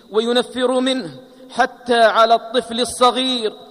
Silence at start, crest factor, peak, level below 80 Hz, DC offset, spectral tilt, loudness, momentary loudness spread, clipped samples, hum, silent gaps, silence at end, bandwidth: 0.1 s; 14 dB; -2 dBFS; -58 dBFS; under 0.1%; -2.5 dB/octave; -17 LUFS; 9 LU; under 0.1%; none; none; 0.05 s; 14.5 kHz